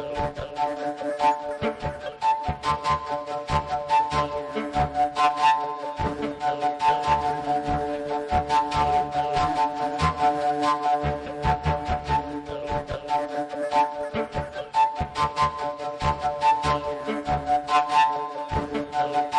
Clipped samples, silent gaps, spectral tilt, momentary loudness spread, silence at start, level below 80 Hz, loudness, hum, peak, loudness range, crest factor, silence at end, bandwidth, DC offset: under 0.1%; none; -5.5 dB/octave; 8 LU; 0 s; -42 dBFS; -25 LUFS; none; -10 dBFS; 3 LU; 14 dB; 0 s; 11.5 kHz; under 0.1%